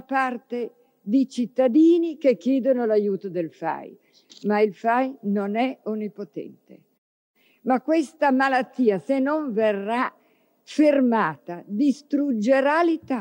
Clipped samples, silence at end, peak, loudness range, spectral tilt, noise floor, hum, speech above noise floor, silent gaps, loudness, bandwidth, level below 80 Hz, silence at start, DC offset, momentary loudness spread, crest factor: under 0.1%; 0 s; -8 dBFS; 5 LU; -6.5 dB/octave; -62 dBFS; none; 40 dB; 6.98-7.34 s; -23 LUFS; 16 kHz; -80 dBFS; 0.1 s; under 0.1%; 13 LU; 14 dB